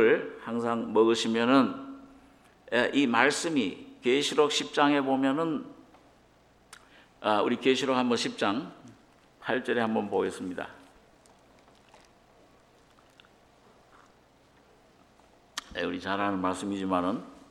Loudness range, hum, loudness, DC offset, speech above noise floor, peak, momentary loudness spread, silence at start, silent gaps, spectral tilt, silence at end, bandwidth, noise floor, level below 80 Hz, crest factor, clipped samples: 11 LU; none; -28 LUFS; under 0.1%; 34 dB; -6 dBFS; 14 LU; 0 s; none; -4 dB/octave; 0.15 s; 13 kHz; -61 dBFS; -68 dBFS; 24 dB; under 0.1%